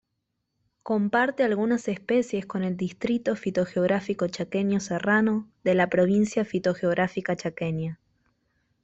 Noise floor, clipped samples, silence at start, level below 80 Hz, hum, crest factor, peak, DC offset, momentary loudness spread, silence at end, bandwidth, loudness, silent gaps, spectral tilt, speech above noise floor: -79 dBFS; under 0.1%; 0.85 s; -64 dBFS; none; 18 dB; -8 dBFS; under 0.1%; 7 LU; 0.9 s; 8.2 kHz; -26 LUFS; none; -6.5 dB/octave; 54 dB